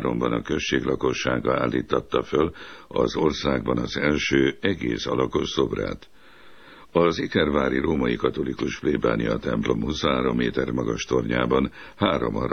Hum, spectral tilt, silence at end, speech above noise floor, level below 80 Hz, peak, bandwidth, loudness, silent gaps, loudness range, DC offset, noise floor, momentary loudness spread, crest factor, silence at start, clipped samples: none; -5.5 dB/octave; 0 s; 27 dB; -42 dBFS; -6 dBFS; 6.6 kHz; -24 LUFS; none; 1 LU; 0.3%; -50 dBFS; 5 LU; 18 dB; 0 s; under 0.1%